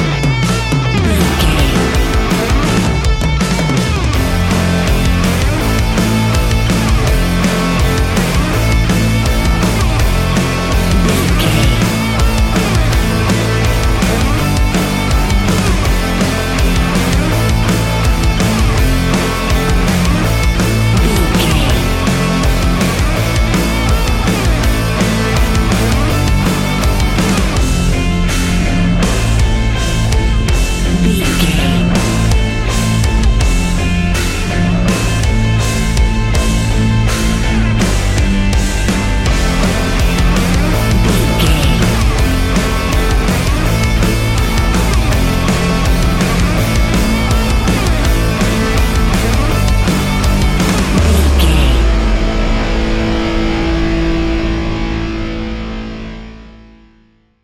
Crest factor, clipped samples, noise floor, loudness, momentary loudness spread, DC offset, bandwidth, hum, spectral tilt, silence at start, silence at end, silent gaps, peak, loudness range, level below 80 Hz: 12 dB; under 0.1%; -50 dBFS; -13 LUFS; 3 LU; under 0.1%; 17 kHz; none; -5 dB/octave; 0 s; 0.9 s; none; 0 dBFS; 1 LU; -16 dBFS